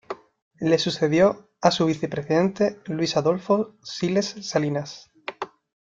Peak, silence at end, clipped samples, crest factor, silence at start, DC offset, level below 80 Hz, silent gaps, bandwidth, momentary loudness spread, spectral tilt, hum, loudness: -2 dBFS; 0.35 s; under 0.1%; 22 dB; 0.1 s; under 0.1%; -62 dBFS; 0.42-0.51 s; 7.8 kHz; 17 LU; -5.5 dB/octave; none; -23 LUFS